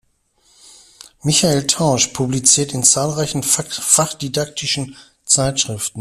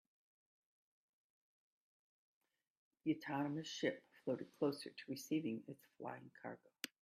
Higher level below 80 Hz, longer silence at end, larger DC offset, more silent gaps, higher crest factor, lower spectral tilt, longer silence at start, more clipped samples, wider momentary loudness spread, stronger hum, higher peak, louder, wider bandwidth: first, -48 dBFS vs under -90 dBFS; second, 0 s vs 0.15 s; neither; neither; about the same, 18 dB vs 22 dB; second, -3 dB/octave vs -5 dB/octave; second, 1.25 s vs 3.05 s; neither; about the same, 9 LU vs 11 LU; neither; first, 0 dBFS vs -24 dBFS; first, -15 LUFS vs -45 LUFS; first, 16 kHz vs 14 kHz